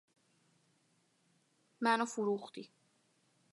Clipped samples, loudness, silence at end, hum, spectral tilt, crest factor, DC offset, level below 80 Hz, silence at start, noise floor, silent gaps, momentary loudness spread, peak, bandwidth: under 0.1%; -35 LUFS; 0.85 s; none; -4 dB/octave; 24 dB; under 0.1%; under -90 dBFS; 1.8 s; -75 dBFS; none; 18 LU; -18 dBFS; 11.5 kHz